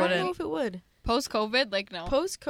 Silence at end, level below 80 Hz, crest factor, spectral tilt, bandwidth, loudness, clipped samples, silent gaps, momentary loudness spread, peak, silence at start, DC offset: 0 s; -48 dBFS; 16 dB; -4 dB/octave; 17 kHz; -28 LUFS; under 0.1%; none; 6 LU; -12 dBFS; 0 s; under 0.1%